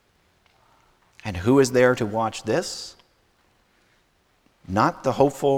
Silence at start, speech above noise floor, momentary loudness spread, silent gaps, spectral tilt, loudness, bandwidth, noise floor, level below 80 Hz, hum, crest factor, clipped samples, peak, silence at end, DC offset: 1.25 s; 43 dB; 16 LU; none; -5.5 dB/octave; -22 LUFS; 16.5 kHz; -64 dBFS; -54 dBFS; none; 20 dB; under 0.1%; -4 dBFS; 0 s; under 0.1%